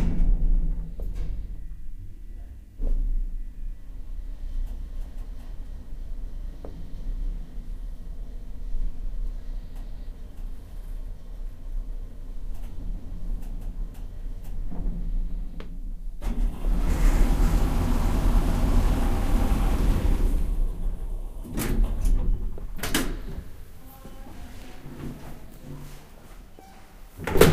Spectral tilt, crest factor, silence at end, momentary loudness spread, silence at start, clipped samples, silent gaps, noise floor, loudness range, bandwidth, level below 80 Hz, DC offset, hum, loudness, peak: -5.5 dB/octave; 26 dB; 0 s; 18 LU; 0 s; under 0.1%; none; -45 dBFS; 14 LU; 15.5 kHz; -26 dBFS; under 0.1%; none; -31 LUFS; 0 dBFS